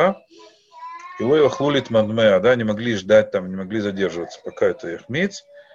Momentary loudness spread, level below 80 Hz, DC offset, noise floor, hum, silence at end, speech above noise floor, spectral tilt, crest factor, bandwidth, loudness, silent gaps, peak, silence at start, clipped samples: 19 LU; -58 dBFS; under 0.1%; -40 dBFS; none; 0.15 s; 20 dB; -6 dB/octave; 18 dB; 7.6 kHz; -20 LUFS; none; -2 dBFS; 0 s; under 0.1%